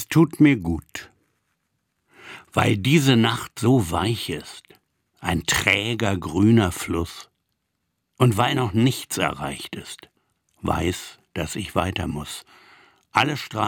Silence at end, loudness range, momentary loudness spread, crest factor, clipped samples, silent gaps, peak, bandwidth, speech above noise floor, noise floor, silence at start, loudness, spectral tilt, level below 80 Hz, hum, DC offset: 0 s; 6 LU; 17 LU; 22 dB; under 0.1%; none; -2 dBFS; 19 kHz; 54 dB; -76 dBFS; 0 s; -22 LUFS; -5 dB/octave; -50 dBFS; none; under 0.1%